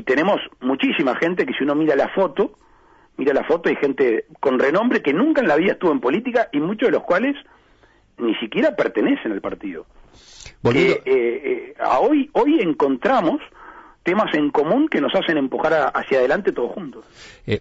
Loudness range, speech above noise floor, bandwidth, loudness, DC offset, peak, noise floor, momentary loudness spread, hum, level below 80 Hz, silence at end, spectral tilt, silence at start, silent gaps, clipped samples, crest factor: 3 LU; 36 dB; 7.8 kHz; -19 LUFS; under 0.1%; -8 dBFS; -55 dBFS; 9 LU; none; -54 dBFS; 0 s; -6.5 dB/octave; 0 s; none; under 0.1%; 12 dB